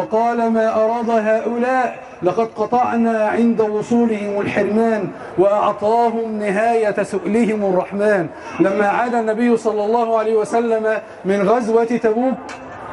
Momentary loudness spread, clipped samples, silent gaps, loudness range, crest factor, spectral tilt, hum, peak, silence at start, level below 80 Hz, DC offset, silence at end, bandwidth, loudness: 5 LU; under 0.1%; none; 1 LU; 14 dB; -6.5 dB/octave; none; -2 dBFS; 0 s; -58 dBFS; under 0.1%; 0 s; 11.5 kHz; -17 LUFS